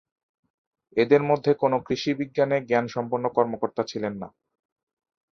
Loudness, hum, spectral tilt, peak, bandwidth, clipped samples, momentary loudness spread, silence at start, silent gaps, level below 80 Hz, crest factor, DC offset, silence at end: -24 LUFS; none; -6.5 dB/octave; -4 dBFS; 6.8 kHz; under 0.1%; 10 LU; 0.95 s; none; -64 dBFS; 20 dB; under 0.1%; 1.1 s